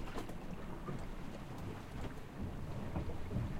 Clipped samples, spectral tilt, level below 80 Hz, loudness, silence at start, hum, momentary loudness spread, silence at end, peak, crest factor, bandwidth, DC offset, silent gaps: under 0.1%; -7 dB/octave; -48 dBFS; -46 LUFS; 0 s; none; 5 LU; 0 s; -26 dBFS; 16 dB; 16 kHz; under 0.1%; none